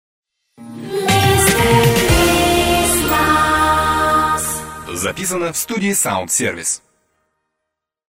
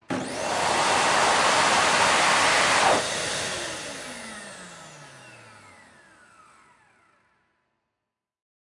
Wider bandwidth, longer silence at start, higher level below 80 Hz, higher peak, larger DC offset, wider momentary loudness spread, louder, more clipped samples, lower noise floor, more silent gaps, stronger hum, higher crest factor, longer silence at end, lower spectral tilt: first, 16.5 kHz vs 12 kHz; first, 0.6 s vs 0.1 s; first, -32 dBFS vs -60 dBFS; first, 0 dBFS vs -8 dBFS; neither; second, 10 LU vs 20 LU; first, -15 LUFS vs -21 LUFS; neither; second, -79 dBFS vs -85 dBFS; neither; neither; about the same, 16 dB vs 18 dB; second, 1.45 s vs 3.3 s; first, -3.5 dB/octave vs -1.5 dB/octave